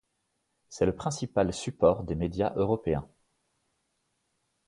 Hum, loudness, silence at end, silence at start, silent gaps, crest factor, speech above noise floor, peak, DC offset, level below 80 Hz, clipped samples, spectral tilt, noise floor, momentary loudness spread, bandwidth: none; -29 LUFS; 1.6 s; 0.7 s; none; 22 dB; 50 dB; -8 dBFS; under 0.1%; -50 dBFS; under 0.1%; -6.5 dB/octave; -78 dBFS; 7 LU; 11.5 kHz